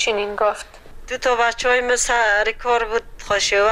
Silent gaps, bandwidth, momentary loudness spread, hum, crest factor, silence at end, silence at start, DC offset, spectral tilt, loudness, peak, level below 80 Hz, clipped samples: none; 15.5 kHz; 9 LU; none; 12 dB; 0 s; 0 s; under 0.1%; -0.5 dB/octave; -19 LUFS; -8 dBFS; -40 dBFS; under 0.1%